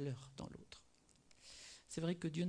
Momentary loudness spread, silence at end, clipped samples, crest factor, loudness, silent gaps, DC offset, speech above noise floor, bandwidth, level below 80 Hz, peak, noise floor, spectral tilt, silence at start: 19 LU; 0 s; under 0.1%; 18 dB; -47 LUFS; none; under 0.1%; 28 dB; 10.5 kHz; -72 dBFS; -28 dBFS; -71 dBFS; -6 dB/octave; 0 s